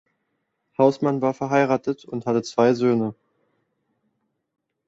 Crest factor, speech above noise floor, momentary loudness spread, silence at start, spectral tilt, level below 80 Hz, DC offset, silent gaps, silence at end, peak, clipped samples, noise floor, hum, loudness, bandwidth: 20 dB; 54 dB; 10 LU; 0.8 s; -7 dB/octave; -66 dBFS; under 0.1%; none; 1.75 s; -4 dBFS; under 0.1%; -75 dBFS; none; -22 LUFS; 8 kHz